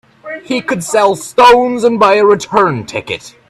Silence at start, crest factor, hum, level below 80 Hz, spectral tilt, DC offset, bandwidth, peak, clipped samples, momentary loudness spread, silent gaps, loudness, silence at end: 0.25 s; 12 dB; none; -48 dBFS; -4 dB/octave; under 0.1%; 14 kHz; 0 dBFS; under 0.1%; 13 LU; none; -11 LUFS; 0.2 s